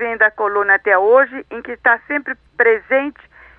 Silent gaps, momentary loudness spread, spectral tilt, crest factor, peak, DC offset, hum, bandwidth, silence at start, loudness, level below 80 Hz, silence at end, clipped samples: none; 15 LU; -7 dB/octave; 16 dB; -2 dBFS; under 0.1%; none; 4.2 kHz; 0 s; -15 LUFS; -56 dBFS; 0.45 s; under 0.1%